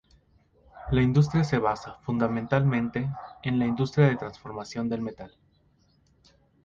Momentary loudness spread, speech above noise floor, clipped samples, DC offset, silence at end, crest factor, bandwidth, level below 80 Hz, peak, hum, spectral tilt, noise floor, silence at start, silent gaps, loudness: 14 LU; 39 dB; under 0.1%; under 0.1%; 1.35 s; 18 dB; 7.4 kHz; -50 dBFS; -8 dBFS; none; -8 dB/octave; -64 dBFS; 0.75 s; none; -27 LUFS